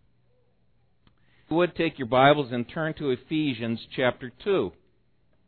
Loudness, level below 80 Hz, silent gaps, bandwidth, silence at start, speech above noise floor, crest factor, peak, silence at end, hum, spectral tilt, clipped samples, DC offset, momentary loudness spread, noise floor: -26 LUFS; -58 dBFS; none; 4.5 kHz; 1.5 s; 43 dB; 20 dB; -6 dBFS; 0.75 s; none; -9.5 dB/octave; under 0.1%; under 0.1%; 11 LU; -68 dBFS